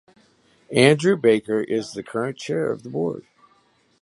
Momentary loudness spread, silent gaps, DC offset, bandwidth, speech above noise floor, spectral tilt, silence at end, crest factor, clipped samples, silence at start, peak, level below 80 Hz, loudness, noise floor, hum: 12 LU; none; under 0.1%; 11.5 kHz; 40 dB; -5.5 dB/octave; 0.85 s; 22 dB; under 0.1%; 0.7 s; 0 dBFS; -64 dBFS; -21 LUFS; -61 dBFS; none